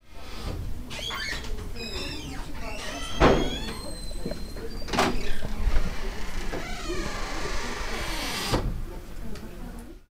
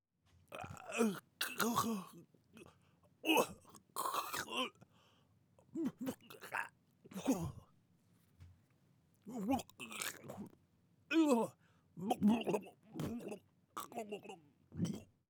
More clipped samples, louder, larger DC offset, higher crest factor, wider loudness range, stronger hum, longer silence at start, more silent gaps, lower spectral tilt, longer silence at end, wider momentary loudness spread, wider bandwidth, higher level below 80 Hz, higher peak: neither; first, -31 LUFS vs -40 LUFS; first, 0.5% vs under 0.1%; about the same, 22 dB vs 26 dB; second, 4 LU vs 7 LU; neither; second, 0 s vs 0.5 s; neither; about the same, -4.5 dB/octave vs -4.5 dB/octave; second, 0 s vs 0.25 s; second, 15 LU vs 19 LU; second, 16 kHz vs over 20 kHz; first, -32 dBFS vs -80 dBFS; first, -6 dBFS vs -16 dBFS